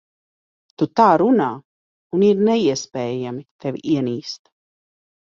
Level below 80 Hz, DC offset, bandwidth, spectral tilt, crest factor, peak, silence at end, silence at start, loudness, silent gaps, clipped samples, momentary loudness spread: -64 dBFS; under 0.1%; 7.6 kHz; -6 dB/octave; 18 dB; -2 dBFS; 0.85 s; 0.8 s; -19 LUFS; 1.65-2.10 s, 3.51-3.59 s; under 0.1%; 15 LU